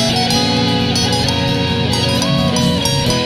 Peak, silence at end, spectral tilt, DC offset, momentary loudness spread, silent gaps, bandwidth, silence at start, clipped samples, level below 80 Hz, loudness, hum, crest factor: -2 dBFS; 0 s; -4.5 dB/octave; under 0.1%; 2 LU; none; 15 kHz; 0 s; under 0.1%; -34 dBFS; -14 LUFS; none; 14 dB